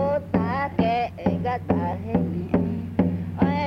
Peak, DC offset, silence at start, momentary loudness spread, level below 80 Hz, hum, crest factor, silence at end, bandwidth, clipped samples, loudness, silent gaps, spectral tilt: -6 dBFS; under 0.1%; 0 s; 2 LU; -46 dBFS; none; 18 dB; 0 s; 5.8 kHz; under 0.1%; -25 LUFS; none; -9.5 dB/octave